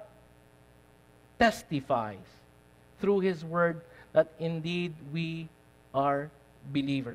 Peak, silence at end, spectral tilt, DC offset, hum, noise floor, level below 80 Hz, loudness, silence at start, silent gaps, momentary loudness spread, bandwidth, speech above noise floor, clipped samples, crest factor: -10 dBFS; 0 s; -6.5 dB/octave; under 0.1%; 60 Hz at -60 dBFS; -59 dBFS; -62 dBFS; -31 LUFS; 0 s; none; 15 LU; 15 kHz; 29 dB; under 0.1%; 22 dB